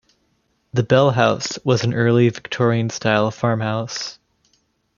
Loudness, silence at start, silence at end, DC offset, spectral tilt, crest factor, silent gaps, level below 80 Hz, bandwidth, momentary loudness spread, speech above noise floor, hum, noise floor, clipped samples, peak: -19 LUFS; 0.75 s; 0.85 s; under 0.1%; -6 dB/octave; 18 dB; none; -58 dBFS; 7.4 kHz; 9 LU; 48 dB; none; -66 dBFS; under 0.1%; 0 dBFS